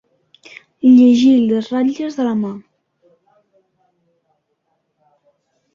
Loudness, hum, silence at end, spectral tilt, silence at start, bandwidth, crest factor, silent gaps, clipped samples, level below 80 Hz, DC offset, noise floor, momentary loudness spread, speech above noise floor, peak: -14 LUFS; none; 3.15 s; -6.5 dB/octave; 0.85 s; 7 kHz; 16 dB; none; under 0.1%; -62 dBFS; under 0.1%; -69 dBFS; 13 LU; 56 dB; -2 dBFS